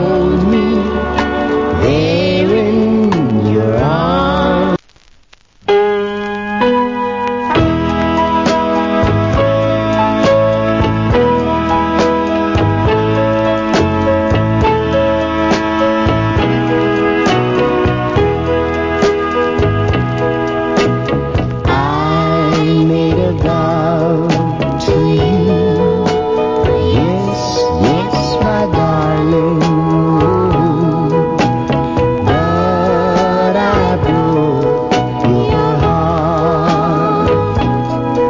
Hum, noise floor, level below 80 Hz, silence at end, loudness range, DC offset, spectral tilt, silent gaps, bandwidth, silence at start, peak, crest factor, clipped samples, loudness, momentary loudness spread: none; -46 dBFS; -28 dBFS; 0 s; 2 LU; under 0.1%; -7 dB/octave; none; 7.6 kHz; 0 s; 0 dBFS; 12 dB; under 0.1%; -13 LUFS; 3 LU